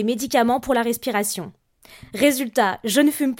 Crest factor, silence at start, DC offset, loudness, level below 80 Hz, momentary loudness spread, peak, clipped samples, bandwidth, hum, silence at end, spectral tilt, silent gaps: 16 dB; 0 s; under 0.1%; -20 LUFS; -56 dBFS; 9 LU; -4 dBFS; under 0.1%; 17 kHz; none; 0.05 s; -3.5 dB/octave; none